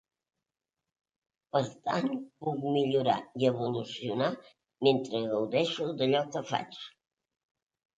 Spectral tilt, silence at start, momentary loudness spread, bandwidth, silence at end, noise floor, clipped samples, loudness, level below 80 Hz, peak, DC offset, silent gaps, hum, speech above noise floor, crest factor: -6 dB/octave; 1.55 s; 8 LU; 9 kHz; 1.1 s; -90 dBFS; under 0.1%; -31 LUFS; -76 dBFS; -10 dBFS; under 0.1%; none; none; 60 dB; 22 dB